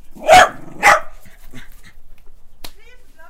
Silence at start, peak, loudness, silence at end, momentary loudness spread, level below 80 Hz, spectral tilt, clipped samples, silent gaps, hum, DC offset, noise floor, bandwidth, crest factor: 0.05 s; 0 dBFS; -12 LUFS; 0.05 s; 7 LU; -38 dBFS; -1.5 dB/octave; under 0.1%; none; none; under 0.1%; -35 dBFS; 16.5 kHz; 18 dB